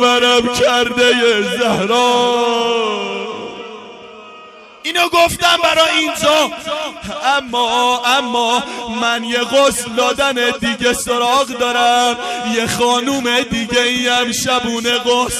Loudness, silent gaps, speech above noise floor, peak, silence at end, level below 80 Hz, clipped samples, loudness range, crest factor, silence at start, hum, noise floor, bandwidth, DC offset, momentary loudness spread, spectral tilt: -14 LUFS; none; 23 dB; -2 dBFS; 0 s; -46 dBFS; under 0.1%; 3 LU; 12 dB; 0 s; none; -38 dBFS; 15 kHz; under 0.1%; 10 LU; -2 dB/octave